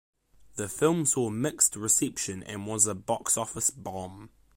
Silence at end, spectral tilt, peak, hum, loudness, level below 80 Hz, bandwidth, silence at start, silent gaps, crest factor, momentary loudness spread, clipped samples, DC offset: 0.3 s; -3.5 dB/octave; -8 dBFS; none; -26 LUFS; -62 dBFS; 16.5 kHz; 0.55 s; none; 20 dB; 14 LU; under 0.1%; under 0.1%